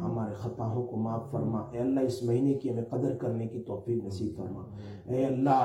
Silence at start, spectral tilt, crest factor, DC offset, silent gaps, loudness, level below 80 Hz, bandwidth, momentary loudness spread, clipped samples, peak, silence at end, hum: 0 s; -8.5 dB/octave; 18 dB; under 0.1%; none; -32 LUFS; -62 dBFS; 12 kHz; 9 LU; under 0.1%; -12 dBFS; 0 s; none